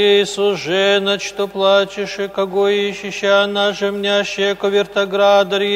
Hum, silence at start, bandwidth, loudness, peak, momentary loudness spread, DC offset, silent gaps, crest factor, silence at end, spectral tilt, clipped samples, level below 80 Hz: 50 Hz at -45 dBFS; 0 s; 15 kHz; -16 LUFS; -2 dBFS; 7 LU; under 0.1%; none; 14 dB; 0 s; -3.5 dB/octave; under 0.1%; -58 dBFS